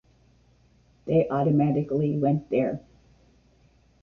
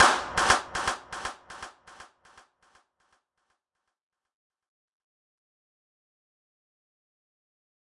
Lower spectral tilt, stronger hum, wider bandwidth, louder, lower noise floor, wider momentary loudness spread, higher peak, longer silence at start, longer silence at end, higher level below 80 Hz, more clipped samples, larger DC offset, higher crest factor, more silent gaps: first, -11 dB/octave vs -1 dB/octave; neither; second, 5.8 kHz vs 11.5 kHz; about the same, -25 LUFS vs -26 LUFS; second, -60 dBFS vs -84 dBFS; second, 8 LU vs 21 LU; about the same, -10 dBFS vs -8 dBFS; first, 1.05 s vs 0 s; second, 1.25 s vs 5.95 s; about the same, -58 dBFS vs -58 dBFS; neither; neither; second, 18 dB vs 26 dB; neither